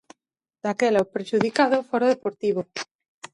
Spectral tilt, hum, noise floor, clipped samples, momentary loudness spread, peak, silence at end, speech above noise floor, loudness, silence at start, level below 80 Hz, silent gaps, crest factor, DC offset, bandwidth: -5 dB/octave; none; -85 dBFS; under 0.1%; 12 LU; -4 dBFS; 0.1 s; 62 dB; -23 LUFS; 0.65 s; -68 dBFS; 2.91-2.99 s, 3.08-3.22 s; 20 dB; under 0.1%; 11.5 kHz